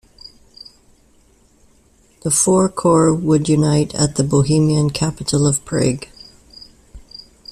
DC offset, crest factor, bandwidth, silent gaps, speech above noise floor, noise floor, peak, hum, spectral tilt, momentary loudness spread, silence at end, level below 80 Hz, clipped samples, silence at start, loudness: under 0.1%; 16 dB; 14 kHz; none; 38 dB; -53 dBFS; -2 dBFS; none; -5.5 dB/octave; 18 LU; 0.5 s; -44 dBFS; under 0.1%; 2.25 s; -16 LUFS